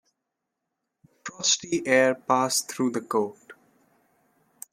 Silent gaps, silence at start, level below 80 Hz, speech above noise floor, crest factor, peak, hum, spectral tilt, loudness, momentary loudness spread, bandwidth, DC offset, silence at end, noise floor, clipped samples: none; 1.25 s; -74 dBFS; 59 dB; 22 dB; -6 dBFS; none; -2.5 dB/octave; -24 LUFS; 17 LU; 16.5 kHz; under 0.1%; 1.2 s; -83 dBFS; under 0.1%